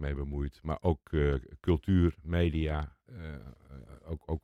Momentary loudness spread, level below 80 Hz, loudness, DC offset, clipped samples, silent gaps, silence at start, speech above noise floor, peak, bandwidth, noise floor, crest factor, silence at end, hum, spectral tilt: 20 LU; -40 dBFS; -31 LUFS; under 0.1%; under 0.1%; none; 0 s; 19 dB; -16 dBFS; 4.9 kHz; -50 dBFS; 16 dB; 0.05 s; none; -9 dB/octave